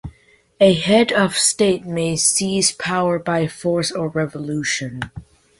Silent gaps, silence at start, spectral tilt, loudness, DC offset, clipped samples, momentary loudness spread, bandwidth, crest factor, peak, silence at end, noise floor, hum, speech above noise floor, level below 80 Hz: none; 0.05 s; -3.5 dB/octave; -18 LUFS; under 0.1%; under 0.1%; 9 LU; 12 kHz; 18 dB; -2 dBFS; 0.4 s; -54 dBFS; none; 36 dB; -50 dBFS